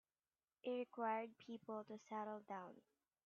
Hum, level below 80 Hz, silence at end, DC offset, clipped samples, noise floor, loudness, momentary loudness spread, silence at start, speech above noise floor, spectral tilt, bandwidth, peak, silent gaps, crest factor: none; under -90 dBFS; 0.45 s; under 0.1%; under 0.1%; under -90 dBFS; -49 LUFS; 11 LU; 0.65 s; over 41 dB; -4 dB/octave; 7 kHz; -32 dBFS; none; 18 dB